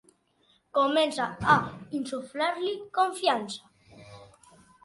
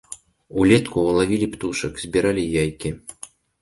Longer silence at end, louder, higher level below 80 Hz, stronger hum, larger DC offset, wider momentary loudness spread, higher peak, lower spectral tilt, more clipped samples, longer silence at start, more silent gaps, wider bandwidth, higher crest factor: first, 0.6 s vs 0.35 s; second, -27 LUFS vs -21 LUFS; second, -62 dBFS vs -44 dBFS; neither; neither; second, 11 LU vs 22 LU; second, -6 dBFS vs -2 dBFS; about the same, -4.5 dB/octave vs -5.5 dB/octave; neither; first, 0.75 s vs 0.1 s; neither; about the same, 11.5 kHz vs 11.5 kHz; first, 24 dB vs 18 dB